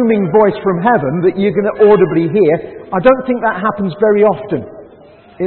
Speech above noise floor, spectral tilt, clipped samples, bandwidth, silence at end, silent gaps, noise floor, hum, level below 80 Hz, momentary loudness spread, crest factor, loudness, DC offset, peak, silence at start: 29 dB; -11 dB/octave; under 0.1%; 4.3 kHz; 0 s; none; -41 dBFS; none; -48 dBFS; 9 LU; 12 dB; -13 LUFS; under 0.1%; 0 dBFS; 0 s